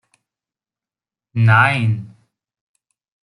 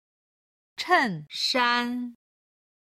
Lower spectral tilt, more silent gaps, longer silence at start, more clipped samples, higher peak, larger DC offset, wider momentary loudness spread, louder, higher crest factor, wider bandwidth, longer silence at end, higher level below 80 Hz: first, -7 dB/octave vs -3 dB/octave; neither; first, 1.35 s vs 0.8 s; neither; first, -2 dBFS vs -10 dBFS; neither; about the same, 14 LU vs 15 LU; first, -15 LUFS vs -25 LUFS; about the same, 18 dB vs 20 dB; second, 11 kHz vs 15.5 kHz; first, 1.15 s vs 0.75 s; first, -58 dBFS vs -76 dBFS